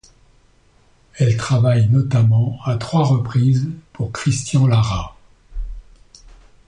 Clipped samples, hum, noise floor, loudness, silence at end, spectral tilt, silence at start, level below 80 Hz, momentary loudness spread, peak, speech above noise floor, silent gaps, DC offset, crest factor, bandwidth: under 0.1%; none; -54 dBFS; -18 LUFS; 0.85 s; -6.5 dB/octave; 1.15 s; -38 dBFS; 19 LU; -4 dBFS; 38 dB; none; under 0.1%; 14 dB; 10 kHz